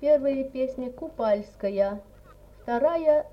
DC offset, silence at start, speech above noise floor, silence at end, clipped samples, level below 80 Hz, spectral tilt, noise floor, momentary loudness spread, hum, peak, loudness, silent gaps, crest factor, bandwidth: under 0.1%; 0 s; 25 dB; 0.05 s; under 0.1%; -54 dBFS; -7.5 dB/octave; -50 dBFS; 12 LU; 50 Hz at -55 dBFS; -10 dBFS; -26 LUFS; none; 16 dB; 6 kHz